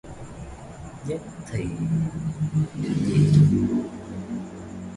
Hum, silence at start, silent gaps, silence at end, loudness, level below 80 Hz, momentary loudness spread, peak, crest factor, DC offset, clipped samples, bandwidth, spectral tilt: none; 0.05 s; none; 0 s; -24 LUFS; -46 dBFS; 22 LU; -6 dBFS; 18 dB; under 0.1%; under 0.1%; 11 kHz; -8 dB/octave